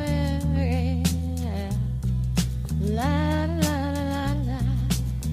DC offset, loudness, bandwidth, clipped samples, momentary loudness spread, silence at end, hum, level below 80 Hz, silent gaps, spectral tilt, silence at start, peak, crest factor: under 0.1%; -26 LUFS; 15.5 kHz; under 0.1%; 4 LU; 0 s; none; -30 dBFS; none; -6 dB/octave; 0 s; -8 dBFS; 16 dB